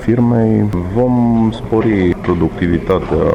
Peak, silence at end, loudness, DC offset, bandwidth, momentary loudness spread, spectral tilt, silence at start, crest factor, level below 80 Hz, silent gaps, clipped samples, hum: -4 dBFS; 0 s; -14 LUFS; under 0.1%; 8.4 kHz; 4 LU; -9.5 dB/octave; 0 s; 10 dB; -30 dBFS; none; under 0.1%; none